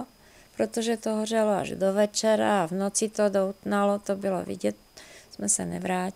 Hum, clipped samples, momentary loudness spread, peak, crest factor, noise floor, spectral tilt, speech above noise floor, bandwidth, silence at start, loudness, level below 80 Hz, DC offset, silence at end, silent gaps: none; under 0.1%; 8 LU; -12 dBFS; 16 dB; -55 dBFS; -4 dB/octave; 29 dB; 16 kHz; 0 s; -26 LUFS; -64 dBFS; under 0.1%; 0.05 s; none